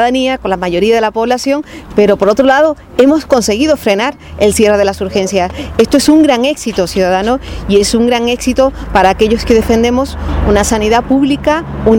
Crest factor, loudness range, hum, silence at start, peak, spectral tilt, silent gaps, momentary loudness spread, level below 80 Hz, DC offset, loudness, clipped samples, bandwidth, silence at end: 10 dB; 1 LU; none; 0 s; 0 dBFS; -4.5 dB/octave; none; 7 LU; -26 dBFS; under 0.1%; -11 LUFS; 0.3%; 18.5 kHz; 0 s